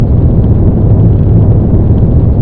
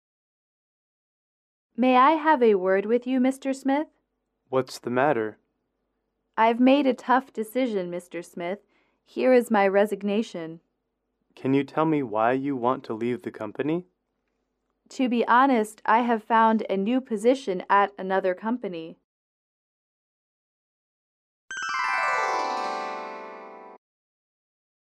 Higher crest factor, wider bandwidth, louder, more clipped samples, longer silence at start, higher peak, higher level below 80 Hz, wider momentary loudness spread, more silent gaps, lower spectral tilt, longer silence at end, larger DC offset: second, 6 dB vs 18 dB; second, 2.1 kHz vs 13.5 kHz; first, -8 LUFS vs -24 LUFS; first, 2% vs under 0.1%; second, 0 s vs 1.8 s; first, 0 dBFS vs -8 dBFS; first, -12 dBFS vs -78 dBFS; second, 1 LU vs 15 LU; second, none vs 19.04-21.48 s; first, -14.5 dB/octave vs -5.5 dB/octave; second, 0 s vs 1.1 s; first, 1% vs under 0.1%